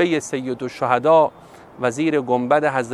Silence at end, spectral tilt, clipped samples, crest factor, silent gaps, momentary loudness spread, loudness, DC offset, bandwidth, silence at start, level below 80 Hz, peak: 0 s; -5.5 dB/octave; under 0.1%; 18 dB; none; 10 LU; -19 LUFS; under 0.1%; 12.5 kHz; 0 s; -64 dBFS; -2 dBFS